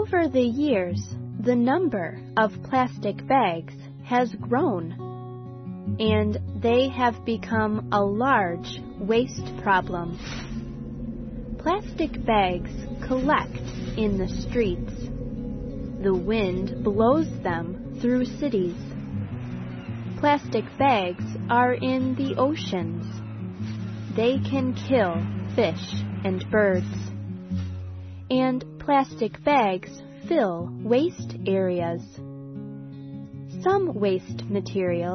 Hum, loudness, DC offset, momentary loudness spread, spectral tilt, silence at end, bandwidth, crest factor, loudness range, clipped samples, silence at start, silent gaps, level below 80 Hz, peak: none; -25 LUFS; under 0.1%; 13 LU; -7 dB/octave; 0 s; 6.4 kHz; 18 dB; 3 LU; under 0.1%; 0 s; none; -44 dBFS; -8 dBFS